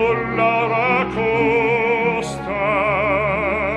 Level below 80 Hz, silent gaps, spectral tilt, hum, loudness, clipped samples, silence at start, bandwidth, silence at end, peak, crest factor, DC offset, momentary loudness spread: -42 dBFS; none; -6 dB/octave; none; -18 LUFS; under 0.1%; 0 s; 11 kHz; 0 s; -4 dBFS; 14 dB; under 0.1%; 4 LU